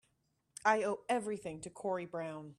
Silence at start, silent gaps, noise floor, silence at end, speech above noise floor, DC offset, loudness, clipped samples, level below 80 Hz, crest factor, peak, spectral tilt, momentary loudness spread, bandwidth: 0.65 s; none; -79 dBFS; 0.05 s; 43 dB; under 0.1%; -37 LUFS; under 0.1%; -76 dBFS; 22 dB; -16 dBFS; -4.5 dB/octave; 11 LU; 13 kHz